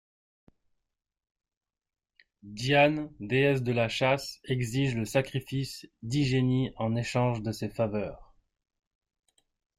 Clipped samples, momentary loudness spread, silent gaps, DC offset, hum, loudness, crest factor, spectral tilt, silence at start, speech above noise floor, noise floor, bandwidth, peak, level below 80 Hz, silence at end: under 0.1%; 10 LU; none; under 0.1%; none; -29 LUFS; 20 dB; -6 dB/octave; 2.45 s; 47 dB; -76 dBFS; 15 kHz; -10 dBFS; -58 dBFS; 1.55 s